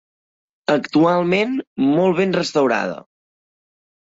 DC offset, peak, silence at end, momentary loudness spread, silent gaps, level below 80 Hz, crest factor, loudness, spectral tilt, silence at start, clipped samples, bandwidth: under 0.1%; -4 dBFS; 1.15 s; 9 LU; 1.67-1.76 s; -62 dBFS; 16 dB; -18 LUFS; -6 dB/octave; 0.7 s; under 0.1%; 8 kHz